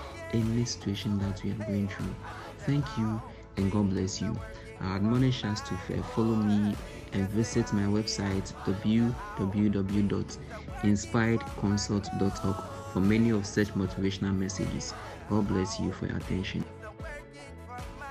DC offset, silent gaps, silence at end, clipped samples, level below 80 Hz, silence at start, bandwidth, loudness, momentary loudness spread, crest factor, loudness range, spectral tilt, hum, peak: under 0.1%; none; 0 s; under 0.1%; -48 dBFS; 0 s; 13.5 kHz; -30 LUFS; 13 LU; 16 dB; 3 LU; -6 dB/octave; none; -12 dBFS